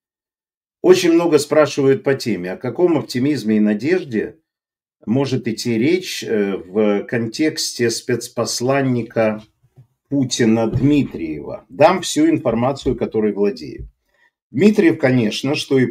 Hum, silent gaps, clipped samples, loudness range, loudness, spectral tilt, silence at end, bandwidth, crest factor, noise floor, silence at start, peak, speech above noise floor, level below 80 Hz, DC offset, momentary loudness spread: none; 14.42-14.50 s; under 0.1%; 3 LU; -17 LUFS; -5.5 dB/octave; 0 s; 16 kHz; 18 dB; under -90 dBFS; 0.85 s; 0 dBFS; over 73 dB; -48 dBFS; under 0.1%; 10 LU